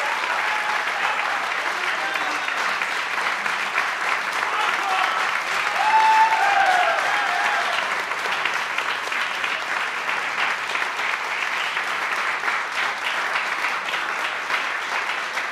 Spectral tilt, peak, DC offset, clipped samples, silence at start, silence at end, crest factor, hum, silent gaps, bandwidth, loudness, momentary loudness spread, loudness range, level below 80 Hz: 0 dB/octave; -6 dBFS; under 0.1%; under 0.1%; 0 s; 0 s; 16 dB; none; none; 15.5 kHz; -21 LUFS; 6 LU; 4 LU; -72 dBFS